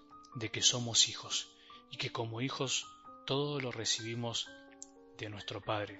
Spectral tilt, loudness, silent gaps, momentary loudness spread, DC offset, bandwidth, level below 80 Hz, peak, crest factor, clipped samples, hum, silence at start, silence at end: -2.5 dB/octave; -34 LUFS; none; 22 LU; under 0.1%; 8 kHz; -72 dBFS; -14 dBFS; 24 dB; under 0.1%; none; 0.1 s; 0 s